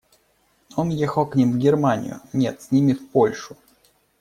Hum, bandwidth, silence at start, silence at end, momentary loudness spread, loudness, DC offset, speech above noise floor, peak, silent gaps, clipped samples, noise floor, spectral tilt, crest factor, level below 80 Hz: none; 14.5 kHz; 0.75 s; 0.65 s; 9 LU; -21 LUFS; under 0.1%; 43 dB; -6 dBFS; none; under 0.1%; -63 dBFS; -7.5 dB/octave; 16 dB; -58 dBFS